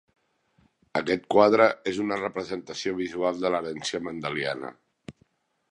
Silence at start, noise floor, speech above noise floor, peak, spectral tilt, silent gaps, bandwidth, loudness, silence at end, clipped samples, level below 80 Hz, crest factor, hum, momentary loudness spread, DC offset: 0.95 s; -67 dBFS; 42 dB; -4 dBFS; -4.5 dB/octave; none; 10.5 kHz; -26 LUFS; 0.6 s; under 0.1%; -64 dBFS; 24 dB; none; 12 LU; under 0.1%